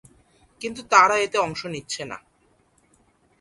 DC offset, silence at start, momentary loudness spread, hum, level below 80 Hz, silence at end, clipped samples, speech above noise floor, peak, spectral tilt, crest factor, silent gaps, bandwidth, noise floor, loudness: under 0.1%; 0.6 s; 19 LU; none; -62 dBFS; 1.25 s; under 0.1%; 41 dB; 0 dBFS; -2.5 dB/octave; 24 dB; none; 11.5 kHz; -63 dBFS; -21 LUFS